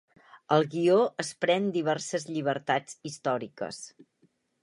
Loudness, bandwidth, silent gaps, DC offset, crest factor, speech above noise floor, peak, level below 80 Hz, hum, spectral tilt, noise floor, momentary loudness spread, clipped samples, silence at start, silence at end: -28 LUFS; 11.5 kHz; none; under 0.1%; 20 dB; 41 dB; -8 dBFS; -78 dBFS; none; -5 dB/octave; -69 dBFS; 14 LU; under 0.1%; 0.35 s; 0.75 s